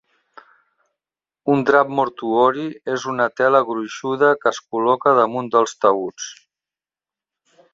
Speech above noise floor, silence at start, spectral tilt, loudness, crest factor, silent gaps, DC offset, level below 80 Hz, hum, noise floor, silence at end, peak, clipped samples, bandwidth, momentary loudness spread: over 72 dB; 1.45 s; -5 dB/octave; -18 LUFS; 18 dB; none; under 0.1%; -66 dBFS; none; under -90 dBFS; 1.4 s; -2 dBFS; under 0.1%; 7.8 kHz; 10 LU